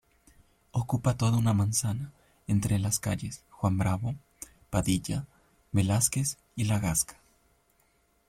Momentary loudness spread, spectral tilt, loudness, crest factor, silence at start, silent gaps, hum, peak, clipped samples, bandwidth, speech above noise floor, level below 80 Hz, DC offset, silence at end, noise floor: 13 LU; -5 dB/octave; -29 LUFS; 20 dB; 0.75 s; none; none; -10 dBFS; under 0.1%; 16 kHz; 41 dB; -52 dBFS; under 0.1%; 1.15 s; -69 dBFS